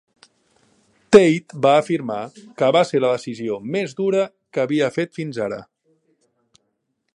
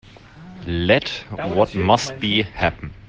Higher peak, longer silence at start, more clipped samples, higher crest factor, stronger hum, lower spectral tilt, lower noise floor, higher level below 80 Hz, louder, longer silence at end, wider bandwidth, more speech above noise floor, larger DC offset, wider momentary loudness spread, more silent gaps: about the same, 0 dBFS vs -2 dBFS; first, 1.1 s vs 0.05 s; neither; about the same, 20 dB vs 20 dB; neither; about the same, -6 dB/octave vs -5 dB/octave; first, -73 dBFS vs -42 dBFS; second, -62 dBFS vs -44 dBFS; about the same, -19 LUFS vs -20 LUFS; first, 1.55 s vs 0.1 s; first, 11 kHz vs 9.8 kHz; first, 54 dB vs 21 dB; neither; first, 14 LU vs 10 LU; neither